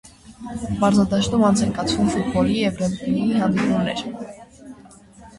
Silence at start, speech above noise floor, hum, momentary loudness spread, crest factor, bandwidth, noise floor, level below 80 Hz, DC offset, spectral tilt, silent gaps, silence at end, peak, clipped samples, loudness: 0.25 s; 26 dB; none; 15 LU; 16 dB; 11.5 kHz; -46 dBFS; -44 dBFS; under 0.1%; -6 dB/octave; none; 0 s; -6 dBFS; under 0.1%; -20 LUFS